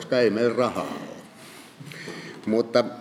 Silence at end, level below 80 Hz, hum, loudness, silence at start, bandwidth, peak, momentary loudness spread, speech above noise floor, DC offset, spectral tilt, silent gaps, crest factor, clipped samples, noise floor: 0 s; -76 dBFS; none; -24 LUFS; 0 s; 15.5 kHz; -6 dBFS; 22 LU; 23 dB; under 0.1%; -5.5 dB/octave; none; 20 dB; under 0.1%; -46 dBFS